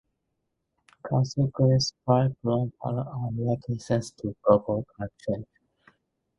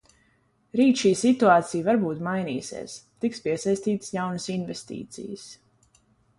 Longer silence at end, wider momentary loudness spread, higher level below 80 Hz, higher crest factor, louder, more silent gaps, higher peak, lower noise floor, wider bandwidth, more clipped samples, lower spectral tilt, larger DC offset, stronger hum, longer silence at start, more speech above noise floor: about the same, 0.95 s vs 0.85 s; second, 11 LU vs 18 LU; first, -56 dBFS vs -66 dBFS; about the same, 20 dB vs 20 dB; second, -27 LUFS vs -24 LUFS; neither; about the same, -6 dBFS vs -4 dBFS; first, -79 dBFS vs -66 dBFS; about the same, 10.5 kHz vs 11.5 kHz; neither; first, -7 dB/octave vs -5.5 dB/octave; neither; neither; first, 1.05 s vs 0.75 s; first, 53 dB vs 41 dB